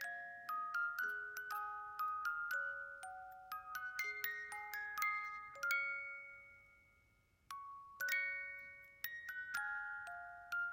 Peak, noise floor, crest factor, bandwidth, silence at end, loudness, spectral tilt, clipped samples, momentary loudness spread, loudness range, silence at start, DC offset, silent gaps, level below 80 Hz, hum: -24 dBFS; -74 dBFS; 22 dB; 16.5 kHz; 0 s; -43 LUFS; 0 dB/octave; under 0.1%; 13 LU; 3 LU; 0 s; under 0.1%; none; -80 dBFS; none